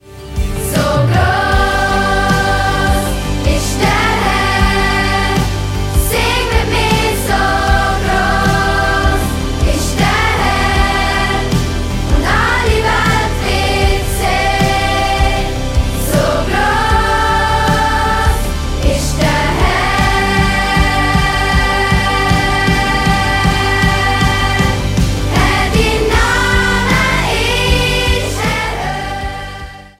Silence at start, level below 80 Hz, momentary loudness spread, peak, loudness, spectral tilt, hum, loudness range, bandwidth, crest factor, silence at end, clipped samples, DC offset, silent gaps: 0.05 s; -18 dBFS; 4 LU; 0 dBFS; -13 LUFS; -4.5 dB/octave; none; 1 LU; 16.5 kHz; 12 dB; 0.1 s; under 0.1%; under 0.1%; none